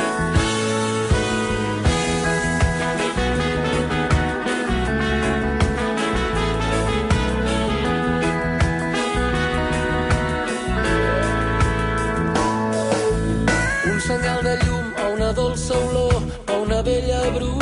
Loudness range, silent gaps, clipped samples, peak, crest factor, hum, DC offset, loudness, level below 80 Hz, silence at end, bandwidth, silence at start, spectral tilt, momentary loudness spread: 1 LU; none; under 0.1%; -6 dBFS; 14 dB; none; under 0.1%; -21 LUFS; -28 dBFS; 0 s; 11.5 kHz; 0 s; -5 dB/octave; 2 LU